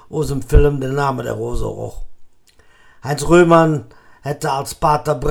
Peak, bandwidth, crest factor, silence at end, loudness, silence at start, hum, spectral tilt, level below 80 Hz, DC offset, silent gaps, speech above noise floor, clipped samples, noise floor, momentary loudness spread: 0 dBFS; 18 kHz; 16 dB; 0 s; -17 LUFS; 0.1 s; none; -6.5 dB/octave; -24 dBFS; under 0.1%; none; 33 dB; under 0.1%; -49 dBFS; 16 LU